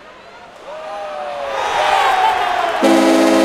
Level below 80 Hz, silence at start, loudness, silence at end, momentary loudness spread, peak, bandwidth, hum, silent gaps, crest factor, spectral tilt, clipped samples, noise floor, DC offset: -52 dBFS; 0.05 s; -15 LUFS; 0 s; 18 LU; 0 dBFS; 15.5 kHz; none; none; 16 dB; -3 dB/octave; under 0.1%; -38 dBFS; under 0.1%